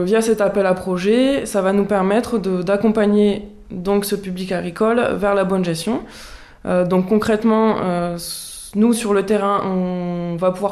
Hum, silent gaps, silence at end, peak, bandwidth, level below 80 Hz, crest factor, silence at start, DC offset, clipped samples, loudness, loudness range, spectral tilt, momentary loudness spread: none; none; 0 s; -4 dBFS; 14.5 kHz; -46 dBFS; 14 dB; 0 s; under 0.1%; under 0.1%; -18 LUFS; 3 LU; -6 dB/octave; 10 LU